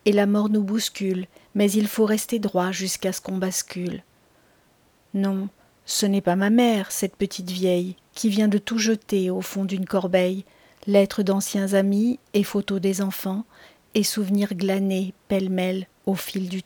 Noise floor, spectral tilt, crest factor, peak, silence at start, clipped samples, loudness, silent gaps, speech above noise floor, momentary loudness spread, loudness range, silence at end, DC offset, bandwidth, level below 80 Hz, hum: -60 dBFS; -5 dB/octave; 18 dB; -6 dBFS; 0.05 s; under 0.1%; -23 LUFS; none; 37 dB; 9 LU; 4 LU; 0.05 s; under 0.1%; over 20 kHz; -62 dBFS; none